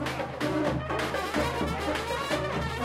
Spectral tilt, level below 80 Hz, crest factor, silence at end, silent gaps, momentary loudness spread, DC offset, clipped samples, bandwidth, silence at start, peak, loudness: -5 dB/octave; -44 dBFS; 16 dB; 0 s; none; 2 LU; under 0.1%; under 0.1%; 16 kHz; 0 s; -14 dBFS; -29 LUFS